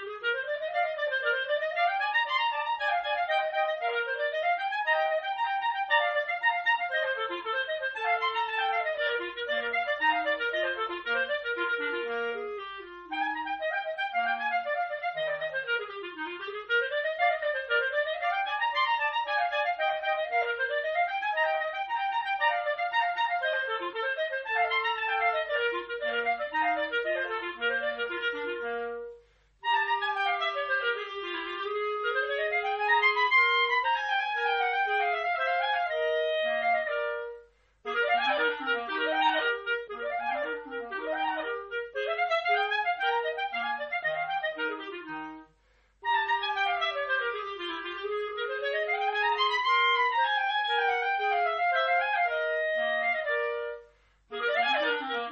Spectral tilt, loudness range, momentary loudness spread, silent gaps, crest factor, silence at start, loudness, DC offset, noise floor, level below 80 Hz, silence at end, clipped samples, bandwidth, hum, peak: 3 dB/octave; 5 LU; 8 LU; none; 16 dB; 0 s; -28 LUFS; under 0.1%; -66 dBFS; -70 dBFS; 0 s; under 0.1%; 7 kHz; none; -14 dBFS